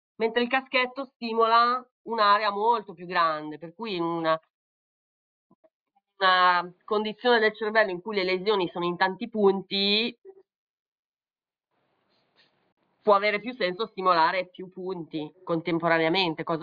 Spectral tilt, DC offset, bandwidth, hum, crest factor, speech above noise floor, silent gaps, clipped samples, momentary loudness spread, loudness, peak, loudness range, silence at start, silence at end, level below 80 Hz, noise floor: -6.5 dB/octave; under 0.1%; 5.2 kHz; none; 20 dB; over 65 dB; 1.16-1.20 s, 1.91-2.05 s, 4.50-5.63 s, 5.71-5.86 s, 10.18-10.22 s, 10.55-11.17 s, 12.72-12.77 s; under 0.1%; 12 LU; -25 LUFS; -8 dBFS; 6 LU; 0.2 s; 0 s; -74 dBFS; under -90 dBFS